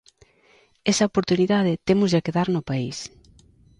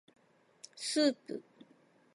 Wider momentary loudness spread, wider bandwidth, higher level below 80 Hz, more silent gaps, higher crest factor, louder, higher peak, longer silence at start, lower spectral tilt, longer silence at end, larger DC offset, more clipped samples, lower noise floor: second, 10 LU vs 23 LU; about the same, 11 kHz vs 11.5 kHz; first, -54 dBFS vs under -90 dBFS; neither; about the same, 18 dB vs 22 dB; first, -22 LUFS vs -34 LUFS; first, -6 dBFS vs -16 dBFS; about the same, 0.85 s vs 0.75 s; first, -5.5 dB/octave vs -2.5 dB/octave; about the same, 0.75 s vs 0.75 s; neither; neither; second, -58 dBFS vs -66 dBFS